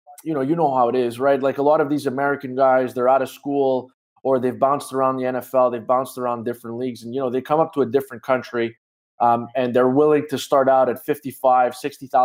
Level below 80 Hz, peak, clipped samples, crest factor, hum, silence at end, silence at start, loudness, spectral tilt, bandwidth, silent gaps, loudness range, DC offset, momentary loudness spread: -72 dBFS; -4 dBFS; under 0.1%; 16 dB; none; 0 s; 0.1 s; -20 LUFS; -6 dB/octave; 16 kHz; 3.94-4.16 s, 8.78-9.18 s; 4 LU; under 0.1%; 9 LU